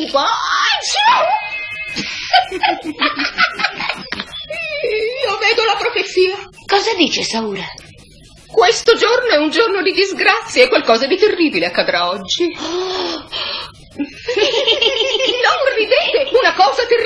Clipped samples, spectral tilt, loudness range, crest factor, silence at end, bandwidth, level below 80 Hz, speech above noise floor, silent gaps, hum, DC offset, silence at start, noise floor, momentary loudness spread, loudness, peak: under 0.1%; -2 dB/octave; 4 LU; 16 dB; 0 s; 11.5 kHz; -50 dBFS; 27 dB; none; none; under 0.1%; 0 s; -42 dBFS; 10 LU; -15 LUFS; 0 dBFS